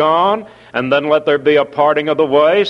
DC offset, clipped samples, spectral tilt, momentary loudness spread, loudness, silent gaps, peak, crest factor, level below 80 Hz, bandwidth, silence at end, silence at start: under 0.1%; under 0.1%; -6.5 dB/octave; 8 LU; -14 LUFS; none; 0 dBFS; 12 dB; -58 dBFS; 6.6 kHz; 0 s; 0 s